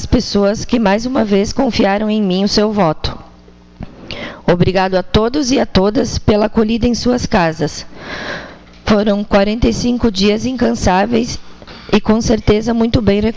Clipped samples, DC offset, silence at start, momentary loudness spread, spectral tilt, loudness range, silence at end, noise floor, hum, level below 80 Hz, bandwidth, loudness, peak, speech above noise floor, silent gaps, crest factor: under 0.1%; under 0.1%; 0 s; 13 LU; -5.5 dB/octave; 2 LU; 0 s; -41 dBFS; none; -30 dBFS; 8 kHz; -14 LUFS; 0 dBFS; 28 dB; none; 14 dB